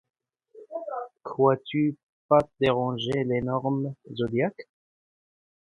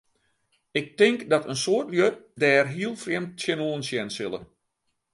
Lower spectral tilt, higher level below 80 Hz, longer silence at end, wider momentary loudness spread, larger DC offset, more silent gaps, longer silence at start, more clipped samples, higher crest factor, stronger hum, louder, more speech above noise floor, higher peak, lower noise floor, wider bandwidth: first, -8 dB/octave vs -4.5 dB/octave; first, -60 dBFS vs -68 dBFS; first, 1.1 s vs 0.7 s; first, 13 LU vs 10 LU; neither; first, 2.03-2.29 s vs none; second, 0.55 s vs 0.75 s; neither; about the same, 22 dB vs 20 dB; neither; about the same, -27 LUFS vs -25 LUFS; second, 27 dB vs 52 dB; about the same, -6 dBFS vs -6 dBFS; second, -52 dBFS vs -77 dBFS; about the same, 10.5 kHz vs 11.5 kHz